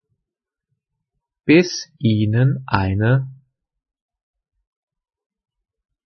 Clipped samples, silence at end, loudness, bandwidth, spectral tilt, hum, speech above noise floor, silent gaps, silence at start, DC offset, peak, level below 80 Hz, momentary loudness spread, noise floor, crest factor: under 0.1%; 2.7 s; -18 LUFS; 6.6 kHz; -6.5 dB/octave; none; 68 dB; none; 1.45 s; under 0.1%; -2 dBFS; -54 dBFS; 9 LU; -85 dBFS; 20 dB